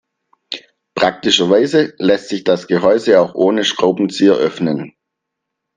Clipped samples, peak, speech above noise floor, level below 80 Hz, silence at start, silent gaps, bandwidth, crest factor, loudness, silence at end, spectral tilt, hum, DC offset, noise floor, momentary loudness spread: under 0.1%; 0 dBFS; 64 dB; -58 dBFS; 0.5 s; none; 9.6 kHz; 16 dB; -14 LUFS; 0.9 s; -4.5 dB/octave; none; under 0.1%; -78 dBFS; 17 LU